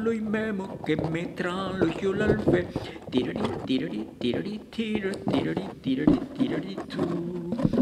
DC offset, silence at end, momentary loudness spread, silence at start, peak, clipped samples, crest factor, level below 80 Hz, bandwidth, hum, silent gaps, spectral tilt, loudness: under 0.1%; 0 s; 8 LU; 0 s; -6 dBFS; under 0.1%; 22 dB; -50 dBFS; 12 kHz; none; none; -7 dB/octave; -28 LUFS